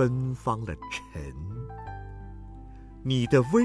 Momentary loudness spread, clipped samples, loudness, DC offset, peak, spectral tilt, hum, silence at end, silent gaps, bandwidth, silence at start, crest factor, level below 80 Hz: 22 LU; under 0.1%; -30 LUFS; under 0.1%; -8 dBFS; -7 dB/octave; none; 0 s; none; 11 kHz; 0 s; 20 dB; -46 dBFS